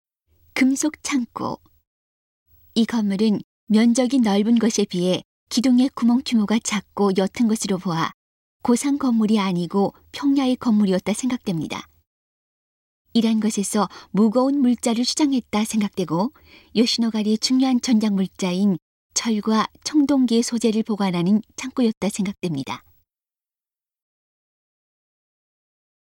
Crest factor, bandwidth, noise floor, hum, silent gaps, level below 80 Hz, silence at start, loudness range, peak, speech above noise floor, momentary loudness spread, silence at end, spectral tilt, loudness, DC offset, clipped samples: 16 dB; 16.5 kHz; under -90 dBFS; none; 1.87-2.46 s, 3.44-3.67 s, 5.25-5.47 s, 8.14-8.60 s, 12.07-13.05 s, 18.82-19.10 s, 21.97-22.01 s; -60 dBFS; 0.55 s; 5 LU; -6 dBFS; over 70 dB; 8 LU; 3.3 s; -5 dB/octave; -21 LUFS; under 0.1%; under 0.1%